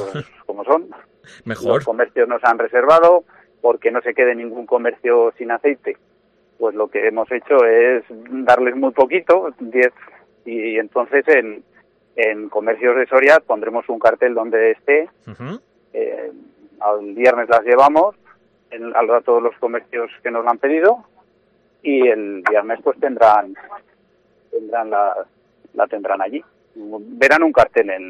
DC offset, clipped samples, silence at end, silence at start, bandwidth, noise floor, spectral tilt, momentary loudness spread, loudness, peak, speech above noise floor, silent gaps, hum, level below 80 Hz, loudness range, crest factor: under 0.1%; under 0.1%; 0 s; 0 s; 9 kHz; -58 dBFS; -6 dB/octave; 18 LU; -16 LUFS; 0 dBFS; 42 dB; none; none; -60 dBFS; 4 LU; 16 dB